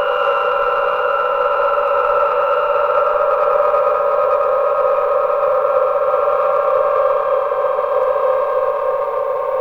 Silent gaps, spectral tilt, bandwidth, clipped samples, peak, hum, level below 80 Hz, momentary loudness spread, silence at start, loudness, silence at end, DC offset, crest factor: none; -4 dB/octave; 5.2 kHz; under 0.1%; -4 dBFS; none; -52 dBFS; 3 LU; 0 s; -16 LUFS; 0 s; under 0.1%; 12 dB